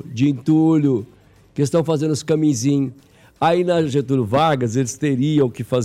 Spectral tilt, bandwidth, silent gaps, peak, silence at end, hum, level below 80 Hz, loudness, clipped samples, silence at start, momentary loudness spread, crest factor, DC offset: -6.5 dB/octave; 13.5 kHz; none; -6 dBFS; 0 s; none; -56 dBFS; -19 LUFS; under 0.1%; 0.05 s; 5 LU; 12 dB; under 0.1%